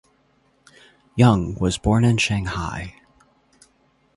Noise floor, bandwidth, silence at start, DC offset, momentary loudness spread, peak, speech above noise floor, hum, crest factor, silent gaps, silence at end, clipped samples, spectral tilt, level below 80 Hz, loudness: -62 dBFS; 11.5 kHz; 1.15 s; under 0.1%; 16 LU; -4 dBFS; 43 dB; none; 18 dB; none; 1.25 s; under 0.1%; -6 dB/octave; -40 dBFS; -20 LUFS